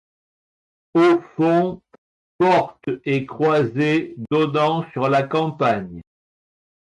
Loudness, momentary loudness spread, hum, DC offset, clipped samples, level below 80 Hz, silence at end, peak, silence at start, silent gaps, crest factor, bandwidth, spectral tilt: -20 LUFS; 9 LU; none; under 0.1%; under 0.1%; -60 dBFS; 0.9 s; -8 dBFS; 0.95 s; 1.98-2.39 s; 14 dB; 10 kHz; -7.5 dB/octave